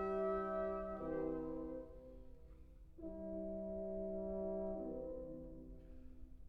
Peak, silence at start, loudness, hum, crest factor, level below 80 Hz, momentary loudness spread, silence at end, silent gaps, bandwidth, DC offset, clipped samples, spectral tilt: -30 dBFS; 0 s; -45 LUFS; none; 16 dB; -58 dBFS; 21 LU; 0 s; none; 5.2 kHz; under 0.1%; under 0.1%; -10 dB/octave